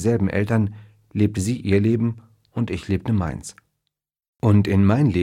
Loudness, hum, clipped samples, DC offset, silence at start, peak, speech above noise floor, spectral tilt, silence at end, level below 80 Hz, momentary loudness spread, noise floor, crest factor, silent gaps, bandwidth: -21 LUFS; none; under 0.1%; under 0.1%; 0 s; -4 dBFS; 61 dB; -7.5 dB/octave; 0 s; -46 dBFS; 14 LU; -80 dBFS; 16 dB; 4.28-4.33 s; 12 kHz